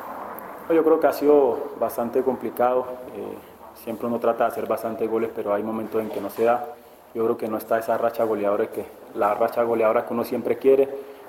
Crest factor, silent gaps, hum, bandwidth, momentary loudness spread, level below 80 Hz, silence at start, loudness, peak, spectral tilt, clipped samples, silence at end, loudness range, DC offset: 18 dB; none; none; 17 kHz; 16 LU; -64 dBFS; 0 s; -23 LUFS; -6 dBFS; -6 dB/octave; under 0.1%; 0 s; 4 LU; under 0.1%